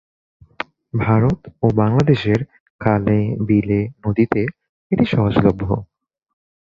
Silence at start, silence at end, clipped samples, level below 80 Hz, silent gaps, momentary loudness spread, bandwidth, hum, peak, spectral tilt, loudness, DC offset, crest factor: 0.95 s; 0.9 s; under 0.1%; -42 dBFS; 2.60-2.79 s, 4.69-4.90 s; 10 LU; 7 kHz; none; -2 dBFS; -9 dB/octave; -18 LUFS; under 0.1%; 18 dB